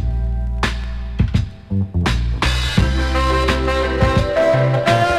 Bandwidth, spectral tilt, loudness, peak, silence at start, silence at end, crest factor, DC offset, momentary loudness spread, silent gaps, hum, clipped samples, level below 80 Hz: 12.5 kHz; -6 dB/octave; -18 LUFS; 0 dBFS; 0 s; 0 s; 16 dB; under 0.1%; 7 LU; none; none; under 0.1%; -22 dBFS